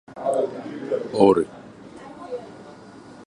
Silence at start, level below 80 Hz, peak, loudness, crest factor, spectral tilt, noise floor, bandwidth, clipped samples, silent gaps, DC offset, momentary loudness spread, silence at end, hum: 0.1 s; -60 dBFS; -2 dBFS; -22 LUFS; 22 dB; -7 dB/octave; -44 dBFS; 11 kHz; under 0.1%; none; under 0.1%; 26 LU; 0 s; none